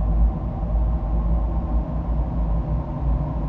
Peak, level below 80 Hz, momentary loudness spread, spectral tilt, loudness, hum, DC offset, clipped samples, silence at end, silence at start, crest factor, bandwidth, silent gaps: -10 dBFS; -22 dBFS; 3 LU; -11.5 dB/octave; -25 LUFS; none; under 0.1%; under 0.1%; 0 s; 0 s; 12 dB; 2.6 kHz; none